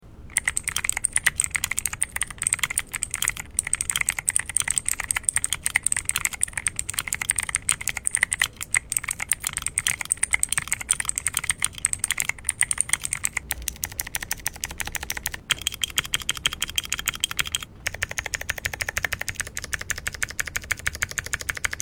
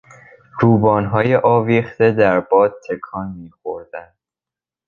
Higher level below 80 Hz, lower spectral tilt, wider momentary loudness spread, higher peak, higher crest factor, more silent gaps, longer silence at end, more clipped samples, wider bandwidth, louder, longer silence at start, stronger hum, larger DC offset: first, -44 dBFS vs -50 dBFS; second, 0.5 dB/octave vs -9.5 dB/octave; second, 7 LU vs 17 LU; about the same, 0 dBFS vs 0 dBFS; first, 28 dB vs 16 dB; neither; second, 0 s vs 0.85 s; neither; first, over 20 kHz vs 7 kHz; second, -25 LUFS vs -15 LUFS; second, 0.05 s vs 0.55 s; neither; neither